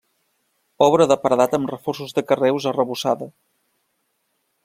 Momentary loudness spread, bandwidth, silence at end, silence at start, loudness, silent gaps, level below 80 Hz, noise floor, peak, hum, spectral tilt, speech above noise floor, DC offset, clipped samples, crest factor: 10 LU; 16 kHz; 1.35 s; 0.8 s; -19 LUFS; none; -64 dBFS; -71 dBFS; 0 dBFS; none; -5.5 dB/octave; 52 dB; under 0.1%; under 0.1%; 20 dB